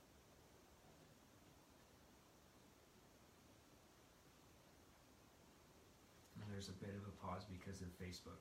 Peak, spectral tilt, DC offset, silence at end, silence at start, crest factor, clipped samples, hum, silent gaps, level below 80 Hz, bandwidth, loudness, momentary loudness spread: -38 dBFS; -5 dB/octave; under 0.1%; 0 s; 0 s; 22 dB; under 0.1%; none; none; -78 dBFS; 16 kHz; -60 LUFS; 16 LU